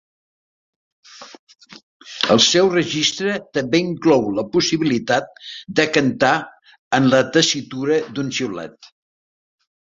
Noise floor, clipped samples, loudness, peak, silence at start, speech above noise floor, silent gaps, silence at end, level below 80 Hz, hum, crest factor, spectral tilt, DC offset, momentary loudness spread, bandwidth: under -90 dBFS; under 0.1%; -18 LUFS; 0 dBFS; 1.1 s; over 72 dB; 1.39-1.47 s, 1.83-2.00 s, 6.79-6.91 s; 1.05 s; -58 dBFS; none; 20 dB; -3.5 dB/octave; under 0.1%; 11 LU; 7.8 kHz